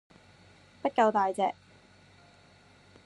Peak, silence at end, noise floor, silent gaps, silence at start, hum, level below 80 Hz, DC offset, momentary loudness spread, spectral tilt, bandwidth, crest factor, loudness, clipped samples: -12 dBFS; 1.55 s; -59 dBFS; none; 0.85 s; none; -74 dBFS; under 0.1%; 10 LU; -5 dB/octave; 11.5 kHz; 20 dB; -28 LUFS; under 0.1%